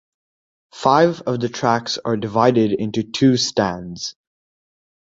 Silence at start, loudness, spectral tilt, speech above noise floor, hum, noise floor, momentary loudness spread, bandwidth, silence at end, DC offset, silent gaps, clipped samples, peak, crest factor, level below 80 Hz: 0.75 s; -19 LUFS; -5 dB/octave; over 72 dB; none; under -90 dBFS; 10 LU; 8 kHz; 0.95 s; under 0.1%; none; under 0.1%; -2 dBFS; 18 dB; -56 dBFS